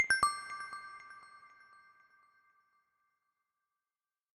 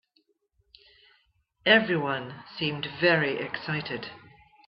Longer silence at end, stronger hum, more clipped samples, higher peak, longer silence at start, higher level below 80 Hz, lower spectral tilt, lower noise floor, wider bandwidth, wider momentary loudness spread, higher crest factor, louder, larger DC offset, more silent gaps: first, 2.9 s vs 0.5 s; neither; neither; second, -16 dBFS vs -6 dBFS; second, 0 s vs 1.65 s; second, -74 dBFS vs -68 dBFS; second, 0.5 dB/octave vs -8 dB/octave; first, under -90 dBFS vs -71 dBFS; first, 13 kHz vs 5.8 kHz; first, 27 LU vs 15 LU; about the same, 26 dB vs 24 dB; second, -35 LUFS vs -26 LUFS; neither; neither